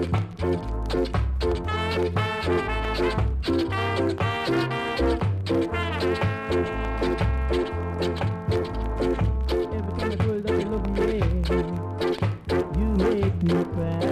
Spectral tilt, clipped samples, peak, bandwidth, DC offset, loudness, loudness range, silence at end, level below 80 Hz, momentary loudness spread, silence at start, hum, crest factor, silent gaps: -7.5 dB/octave; under 0.1%; -12 dBFS; 13 kHz; under 0.1%; -25 LUFS; 1 LU; 0 s; -32 dBFS; 4 LU; 0 s; none; 14 dB; none